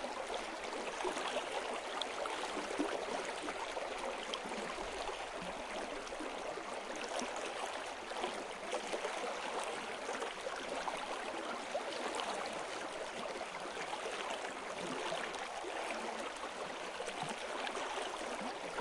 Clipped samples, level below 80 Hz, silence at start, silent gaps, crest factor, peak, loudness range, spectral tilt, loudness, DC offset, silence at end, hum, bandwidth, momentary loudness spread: under 0.1%; -68 dBFS; 0 s; none; 20 dB; -20 dBFS; 2 LU; -2 dB/octave; -41 LUFS; under 0.1%; 0 s; none; 11.5 kHz; 4 LU